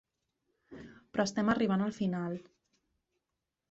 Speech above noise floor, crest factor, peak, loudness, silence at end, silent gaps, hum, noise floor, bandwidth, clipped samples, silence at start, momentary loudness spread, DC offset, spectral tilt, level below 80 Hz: 56 dB; 18 dB; -18 dBFS; -33 LUFS; 1.3 s; none; none; -87 dBFS; 8 kHz; under 0.1%; 0.7 s; 22 LU; under 0.1%; -6 dB/octave; -68 dBFS